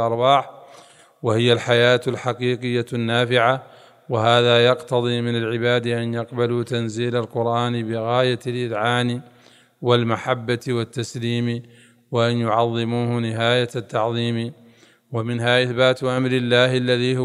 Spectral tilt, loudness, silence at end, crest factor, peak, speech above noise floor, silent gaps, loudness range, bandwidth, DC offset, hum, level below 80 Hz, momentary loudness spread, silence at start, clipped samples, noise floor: -6 dB/octave; -20 LUFS; 0 s; 20 dB; -2 dBFS; 32 dB; none; 4 LU; 11.5 kHz; under 0.1%; none; -66 dBFS; 9 LU; 0 s; under 0.1%; -52 dBFS